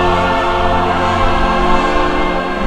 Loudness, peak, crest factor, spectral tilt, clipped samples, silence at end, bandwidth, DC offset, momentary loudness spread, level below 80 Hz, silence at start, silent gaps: -14 LUFS; 0 dBFS; 12 dB; -5.5 dB/octave; under 0.1%; 0 s; 10 kHz; under 0.1%; 2 LU; -20 dBFS; 0 s; none